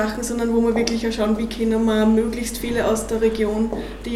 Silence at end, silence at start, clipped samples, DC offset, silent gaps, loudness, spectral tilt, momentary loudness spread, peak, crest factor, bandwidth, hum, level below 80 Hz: 0 s; 0 s; under 0.1%; under 0.1%; none; -21 LUFS; -5 dB/octave; 6 LU; -4 dBFS; 18 dB; 15 kHz; none; -36 dBFS